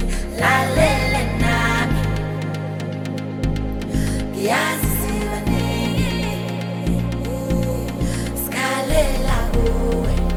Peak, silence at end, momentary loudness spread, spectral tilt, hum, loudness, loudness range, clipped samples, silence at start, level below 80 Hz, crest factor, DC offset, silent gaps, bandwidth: -4 dBFS; 0 s; 8 LU; -5.5 dB/octave; none; -21 LUFS; 3 LU; under 0.1%; 0 s; -26 dBFS; 16 dB; under 0.1%; none; 19.5 kHz